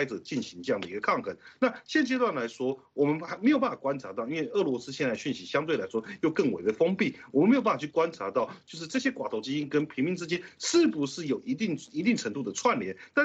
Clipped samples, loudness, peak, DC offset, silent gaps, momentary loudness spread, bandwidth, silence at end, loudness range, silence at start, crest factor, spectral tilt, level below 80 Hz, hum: under 0.1%; -29 LUFS; -12 dBFS; under 0.1%; none; 8 LU; 8.2 kHz; 0 s; 2 LU; 0 s; 18 dB; -5 dB/octave; -72 dBFS; none